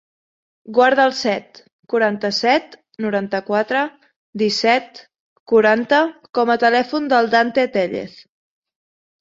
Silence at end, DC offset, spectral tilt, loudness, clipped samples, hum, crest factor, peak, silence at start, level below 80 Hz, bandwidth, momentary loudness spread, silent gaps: 1 s; under 0.1%; -4.5 dB/octave; -18 LUFS; under 0.1%; none; 18 dB; -2 dBFS; 0.7 s; -66 dBFS; 7.8 kHz; 9 LU; 1.72-1.83 s, 4.16-4.33 s, 5.20-5.46 s